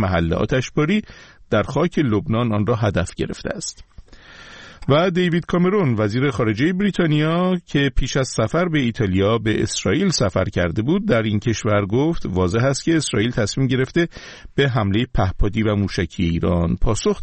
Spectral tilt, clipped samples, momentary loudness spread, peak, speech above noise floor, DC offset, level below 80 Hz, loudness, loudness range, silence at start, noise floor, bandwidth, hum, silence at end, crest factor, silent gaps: -6 dB/octave; under 0.1%; 5 LU; -4 dBFS; 24 dB; 0.2%; -32 dBFS; -20 LUFS; 3 LU; 0 s; -42 dBFS; 8.8 kHz; none; 0 s; 16 dB; none